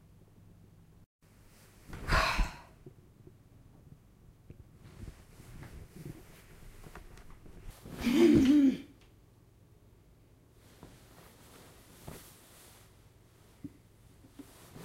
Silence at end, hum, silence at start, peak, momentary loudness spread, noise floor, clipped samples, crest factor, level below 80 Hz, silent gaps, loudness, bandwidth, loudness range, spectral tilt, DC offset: 0 s; none; 1.9 s; -14 dBFS; 30 LU; -61 dBFS; under 0.1%; 22 dB; -46 dBFS; none; -28 LUFS; 16 kHz; 24 LU; -5.5 dB/octave; under 0.1%